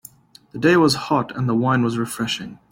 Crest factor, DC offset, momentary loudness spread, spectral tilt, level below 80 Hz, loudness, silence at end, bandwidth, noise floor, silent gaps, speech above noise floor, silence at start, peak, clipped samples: 16 dB; under 0.1%; 9 LU; -5.5 dB/octave; -56 dBFS; -20 LUFS; 0.15 s; 16.5 kHz; -47 dBFS; none; 27 dB; 0.55 s; -4 dBFS; under 0.1%